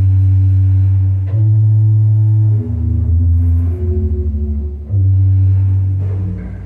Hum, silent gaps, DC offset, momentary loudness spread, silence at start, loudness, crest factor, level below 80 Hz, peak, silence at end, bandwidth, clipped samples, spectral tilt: none; none; under 0.1%; 8 LU; 0 s; -14 LUFS; 6 dB; -26 dBFS; -6 dBFS; 0 s; 1.7 kHz; under 0.1%; -12 dB/octave